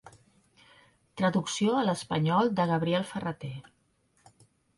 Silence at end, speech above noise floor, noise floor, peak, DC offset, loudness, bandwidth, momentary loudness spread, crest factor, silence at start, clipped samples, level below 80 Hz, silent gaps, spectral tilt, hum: 1.15 s; 42 dB; -70 dBFS; -14 dBFS; under 0.1%; -28 LUFS; 11.5 kHz; 15 LU; 18 dB; 0.05 s; under 0.1%; -68 dBFS; none; -5.5 dB/octave; none